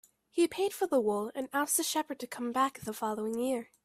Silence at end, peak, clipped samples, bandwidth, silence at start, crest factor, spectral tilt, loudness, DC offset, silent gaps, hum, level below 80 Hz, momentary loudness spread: 0.2 s; -16 dBFS; under 0.1%; 16 kHz; 0.35 s; 16 dB; -3 dB/octave; -32 LUFS; under 0.1%; none; none; -76 dBFS; 7 LU